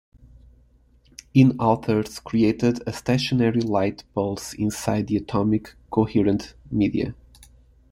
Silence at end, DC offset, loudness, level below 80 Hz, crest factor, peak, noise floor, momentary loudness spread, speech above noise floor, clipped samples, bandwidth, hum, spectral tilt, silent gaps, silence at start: 0.45 s; under 0.1%; -23 LUFS; -50 dBFS; 20 dB; -4 dBFS; -57 dBFS; 10 LU; 35 dB; under 0.1%; 16 kHz; none; -6.5 dB/octave; none; 1.35 s